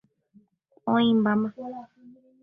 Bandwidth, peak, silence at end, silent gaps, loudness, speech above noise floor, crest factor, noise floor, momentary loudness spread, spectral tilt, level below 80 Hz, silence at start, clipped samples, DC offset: 3.9 kHz; -10 dBFS; 0.3 s; none; -24 LUFS; 37 dB; 16 dB; -61 dBFS; 18 LU; -9 dB/octave; -68 dBFS; 0.85 s; under 0.1%; under 0.1%